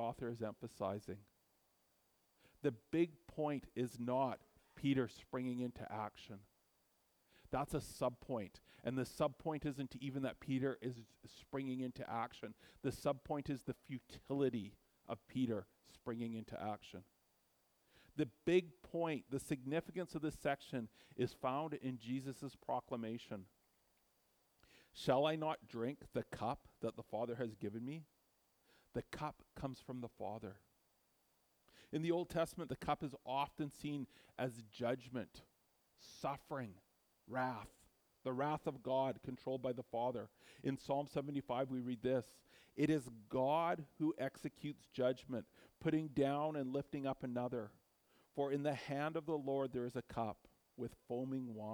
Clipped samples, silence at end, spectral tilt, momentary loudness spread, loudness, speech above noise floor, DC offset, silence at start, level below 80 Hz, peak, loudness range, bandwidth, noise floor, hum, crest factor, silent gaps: under 0.1%; 0 s; -6.5 dB/octave; 11 LU; -43 LUFS; 36 dB; under 0.1%; 0 s; -70 dBFS; -22 dBFS; 6 LU; over 20 kHz; -79 dBFS; none; 20 dB; none